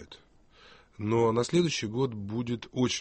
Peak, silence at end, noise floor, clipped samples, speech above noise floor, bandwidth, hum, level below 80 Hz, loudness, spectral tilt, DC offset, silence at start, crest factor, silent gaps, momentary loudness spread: -14 dBFS; 0 s; -58 dBFS; under 0.1%; 30 dB; 8.8 kHz; none; -60 dBFS; -29 LUFS; -5.5 dB/octave; under 0.1%; 0 s; 16 dB; none; 8 LU